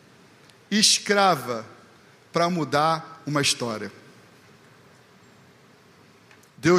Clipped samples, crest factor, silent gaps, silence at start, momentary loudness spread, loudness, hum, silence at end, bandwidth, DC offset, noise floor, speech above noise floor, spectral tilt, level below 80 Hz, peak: under 0.1%; 22 dB; none; 0.7 s; 16 LU; -22 LUFS; none; 0 s; 15.5 kHz; under 0.1%; -54 dBFS; 31 dB; -3 dB/octave; -68 dBFS; -4 dBFS